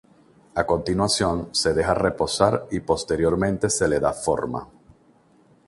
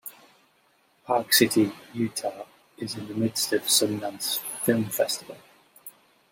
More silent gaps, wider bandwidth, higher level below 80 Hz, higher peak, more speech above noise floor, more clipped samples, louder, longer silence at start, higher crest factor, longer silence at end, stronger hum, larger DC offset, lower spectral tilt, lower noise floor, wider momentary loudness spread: neither; second, 11.5 kHz vs 16.5 kHz; first, -44 dBFS vs -70 dBFS; about the same, -2 dBFS vs -4 dBFS; second, 35 dB vs 39 dB; neither; first, -22 LUFS vs -25 LUFS; first, 0.55 s vs 0.05 s; about the same, 22 dB vs 22 dB; first, 1 s vs 0.4 s; neither; neither; about the same, -4 dB/octave vs -3 dB/octave; second, -57 dBFS vs -65 dBFS; second, 6 LU vs 25 LU